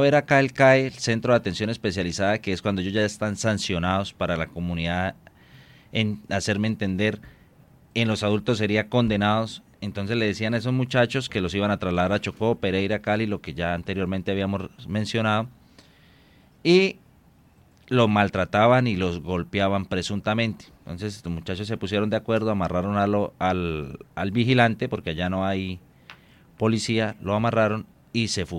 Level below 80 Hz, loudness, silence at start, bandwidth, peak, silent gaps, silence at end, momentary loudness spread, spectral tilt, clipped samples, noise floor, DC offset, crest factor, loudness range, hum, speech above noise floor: -54 dBFS; -24 LUFS; 0 s; 12.5 kHz; -4 dBFS; none; 0 s; 11 LU; -5.5 dB/octave; under 0.1%; -56 dBFS; under 0.1%; 20 dB; 4 LU; none; 32 dB